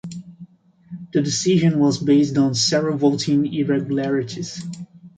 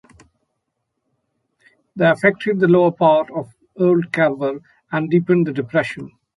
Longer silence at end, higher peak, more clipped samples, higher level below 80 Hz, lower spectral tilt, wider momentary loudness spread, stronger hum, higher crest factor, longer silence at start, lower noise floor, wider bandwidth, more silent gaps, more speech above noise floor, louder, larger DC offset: second, 0.1 s vs 0.3 s; second, -6 dBFS vs -2 dBFS; neither; about the same, -60 dBFS vs -62 dBFS; second, -5.5 dB/octave vs -8 dB/octave; first, 18 LU vs 14 LU; neither; about the same, 14 dB vs 18 dB; second, 0.05 s vs 1.95 s; second, -45 dBFS vs -75 dBFS; second, 9.4 kHz vs 11.5 kHz; neither; second, 27 dB vs 58 dB; about the same, -19 LUFS vs -18 LUFS; neither